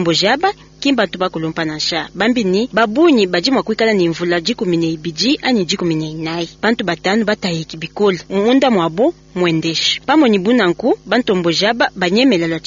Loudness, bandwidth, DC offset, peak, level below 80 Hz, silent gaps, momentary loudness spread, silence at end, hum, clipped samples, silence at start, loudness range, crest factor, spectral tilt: -15 LUFS; 7.6 kHz; under 0.1%; 0 dBFS; -50 dBFS; none; 7 LU; 0.05 s; none; under 0.1%; 0 s; 3 LU; 14 dB; -3.5 dB/octave